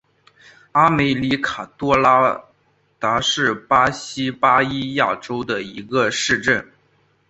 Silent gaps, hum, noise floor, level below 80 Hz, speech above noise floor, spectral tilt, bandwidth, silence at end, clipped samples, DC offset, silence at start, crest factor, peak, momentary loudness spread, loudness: none; none; -62 dBFS; -50 dBFS; 43 dB; -4 dB/octave; 8.2 kHz; 0.65 s; under 0.1%; under 0.1%; 0.75 s; 20 dB; 0 dBFS; 10 LU; -18 LUFS